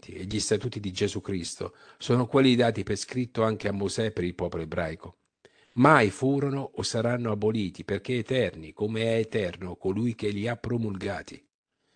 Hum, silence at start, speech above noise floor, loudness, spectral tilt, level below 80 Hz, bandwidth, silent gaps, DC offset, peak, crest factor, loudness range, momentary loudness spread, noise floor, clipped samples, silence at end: none; 0 s; 34 dB; -27 LUFS; -5.5 dB/octave; -56 dBFS; 10 kHz; none; under 0.1%; -4 dBFS; 24 dB; 4 LU; 12 LU; -61 dBFS; under 0.1%; 0.6 s